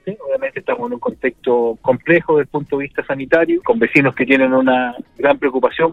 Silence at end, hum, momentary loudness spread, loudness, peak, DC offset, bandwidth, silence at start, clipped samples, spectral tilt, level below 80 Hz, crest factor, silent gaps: 0 s; none; 9 LU; -16 LUFS; 0 dBFS; under 0.1%; 7.6 kHz; 0.05 s; under 0.1%; -7.5 dB/octave; -52 dBFS; 16 dB; none